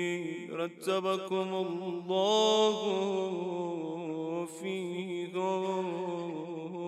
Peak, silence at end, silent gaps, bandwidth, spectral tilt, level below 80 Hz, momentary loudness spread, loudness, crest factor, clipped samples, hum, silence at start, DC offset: -14 dBFS; 0 s; none; 13.5 kHz; -4.5 dB/octave; -86 dBFS; 11 LU; -32 LUFS; 18 dB; under 0.1%; none; 0 s; under 0.1%